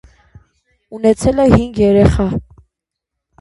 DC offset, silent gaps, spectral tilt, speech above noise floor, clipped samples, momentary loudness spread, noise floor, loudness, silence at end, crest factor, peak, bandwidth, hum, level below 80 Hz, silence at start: under 0.1%; none; -7.5 dB/octave; 68 dB; under 0.1%; 11 LU; -79 dBFS; -13 LUFS; 1 s; 16 dB; 0 dBFS; 11.5 kHz; none; -28 dBFS; 0.9 s